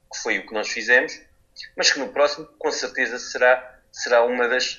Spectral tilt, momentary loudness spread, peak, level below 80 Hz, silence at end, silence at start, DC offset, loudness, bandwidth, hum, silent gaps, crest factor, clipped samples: -0.5 dB/octave; 13 LU; -4 dBFS; -62 dBFS; 0 s; 0.1 s; under 0.1%; -21 LUFS; 7.6 kHz; none; none; 20 dB; under 0.1%